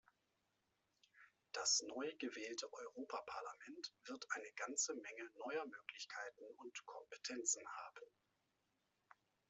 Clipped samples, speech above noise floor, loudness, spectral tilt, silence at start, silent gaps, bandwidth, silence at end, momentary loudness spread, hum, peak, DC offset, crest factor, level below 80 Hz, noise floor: under 0.1%; 38 dB; -46 LUFS; 0.5 dB/octave; 1.15 s; none; 8.2 kHz; 1.45 s; 14 LU; none; -26 dBFS; under 0.1%; 24 dB; under -90 dBFS; -86 dBFS